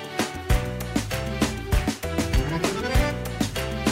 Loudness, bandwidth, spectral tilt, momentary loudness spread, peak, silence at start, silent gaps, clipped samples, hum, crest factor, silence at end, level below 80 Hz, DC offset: -26 LUFS; 16 kHz; -5 dB/octave; 4 LU; -8 dBFS; 0 s; none; under 0.1%; none; 16 dB; 0 s; -30 dBFS; under 0.1%